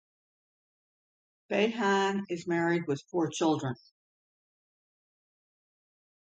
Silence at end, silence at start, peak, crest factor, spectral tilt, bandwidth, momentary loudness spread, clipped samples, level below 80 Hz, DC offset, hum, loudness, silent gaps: 2.6 s; 1.5 s; -14 dBFS; 20 dB; -5 dB/octave; 9.2 kHz; 7 LU; under 0.1%; -80 dBFS; under 0.1%; none; -30 LUFS; none